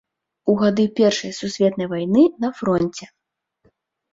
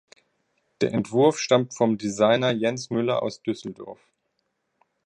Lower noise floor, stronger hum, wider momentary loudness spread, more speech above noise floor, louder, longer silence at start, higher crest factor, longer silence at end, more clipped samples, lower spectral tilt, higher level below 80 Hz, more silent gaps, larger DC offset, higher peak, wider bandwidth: second, -65 dBFS vs -75 dBFS; neither; second, 10 LU vs 13 LU; second, 46 dB vs 52 dB; first, -20 LUFS vs -23 LUFS; second, 0.45 s vs 0.8 s; about the same, 16 dB vs 18 dB; about the same, 1.1 s vs 1.1 s; neither; about the same, -6 dB/octave vs -5 dB/octave; first, -58 dBFS vs -66 dBFS; neither; neither; about the same, -4 dBFS vs -6 dBFS; second, 7.8 kHz vs 10.5 kHz